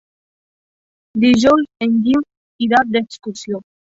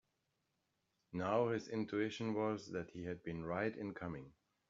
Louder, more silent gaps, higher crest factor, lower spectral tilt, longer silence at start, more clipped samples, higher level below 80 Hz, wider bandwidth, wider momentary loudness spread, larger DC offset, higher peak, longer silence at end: first, -15 LUFS vs -41 LUFS; first, 2.37-2.59 s vs none; about the same, 16 dB vs 20 dB; about the same, -5 dB/octave vs -5.5 dB/octave; about the same, 1.15 s vs 1.1 s; neither; first, -52 dBFS vs -72 dBFS; about the same, 7.8 kHz vs 7.4 kHz; first, 15 LU vs 10 LU; neither; first, -2 dBFS vs -22 dBFS; second, 0.25 s vs 0.4 s